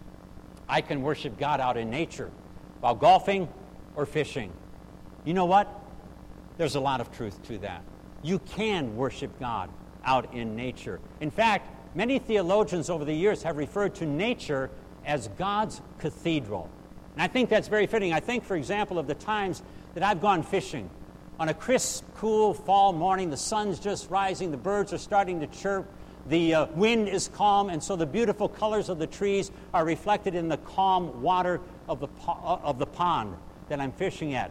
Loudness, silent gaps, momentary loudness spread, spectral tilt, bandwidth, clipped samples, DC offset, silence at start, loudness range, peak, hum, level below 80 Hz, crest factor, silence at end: -28 LUFS; none; 15 LU; -5 dB/octave; 15 kHz; under 0.1%; under 0.1%; 0 s; 5 LU; -10 dBFS; none; -52 dBFS; 18 dB; 0 s